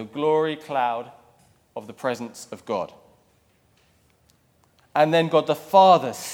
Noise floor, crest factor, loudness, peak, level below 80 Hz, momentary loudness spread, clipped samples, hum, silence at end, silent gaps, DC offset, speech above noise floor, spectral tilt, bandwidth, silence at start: -62 dBFS; 20 dB; -21 LUFS; -4 dBFS; -72 dBFS; 22 LU; under 0.1%; none; 0 s; none; under 0.1%; 41 dB; -5 dB/octave; 18 kHz; 0 s